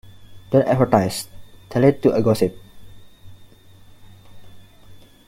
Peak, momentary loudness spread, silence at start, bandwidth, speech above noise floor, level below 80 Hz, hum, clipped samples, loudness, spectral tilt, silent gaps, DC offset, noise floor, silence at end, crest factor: 0 dBFS; 10 LU; 0.2 s; 16.5 kHz; 29 dB; -50 dBFS; none; under 0.1%; -19 LUFS; -7 dB/octave; none; under 0.1%; -46 dBFS; 0.3 s; 22 dB